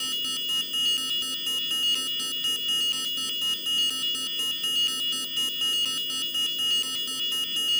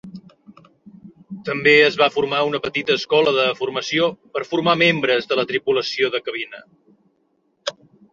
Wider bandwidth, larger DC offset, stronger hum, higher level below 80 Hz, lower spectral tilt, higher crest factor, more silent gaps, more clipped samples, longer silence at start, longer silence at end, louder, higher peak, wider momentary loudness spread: first, over 20 kHz vs 7.6 kHz; neither; neither; second, -72 dBFS vs -64 dBFS; second, 1.5 dB/octave vs -4.5 dB/octave; second, 10 dB vs 20 dB; neither; neither; about the same, 0 s vs 0.05 s; second, 0 s vs 0.4 s; second, -24 LUFS vs -18 LUFS; second, -16 dBFS vs -2 dBFS; second, 3 LU vs 16 LU